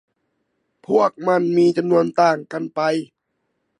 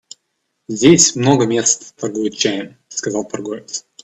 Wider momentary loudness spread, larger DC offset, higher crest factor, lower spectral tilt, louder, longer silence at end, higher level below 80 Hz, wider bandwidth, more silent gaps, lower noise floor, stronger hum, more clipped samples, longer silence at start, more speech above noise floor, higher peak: second, 8 LU vs 16 LU; neither; about the same, 18 dB vs 18 dB; first, -6.5 dB/octave vs -3.5 dB/octave; second, -19 LUFS vs -16 LUFS; first, 0.75 s vs 0.25 s; second, -72 dBFS vs -56 dBFS; first, 10.5 kHz vs 9.2 kHz; neither; about the same, -73 dBFS vs -71 dBFS; neither; neither; first, 0.9 s vs 0.7 s; about the same, 55 dB vs 55 dB; about the same, -2 dBFS vs 0 dBFS